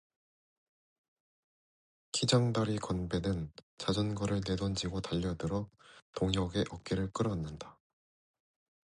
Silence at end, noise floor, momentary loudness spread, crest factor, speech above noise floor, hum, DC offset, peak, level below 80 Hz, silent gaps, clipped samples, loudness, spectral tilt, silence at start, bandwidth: 1.1 s; under -90 dBFS; 12 LU; 22 dB; over 56 dB; none; under 0.1%; -14 dBFS; -52 dBFS; 3.63-3.77 s, 6.02-6.13 s; under 0.1%; -34 LUFS; -5.5 dB/octave; 2.15 s; 11 kHz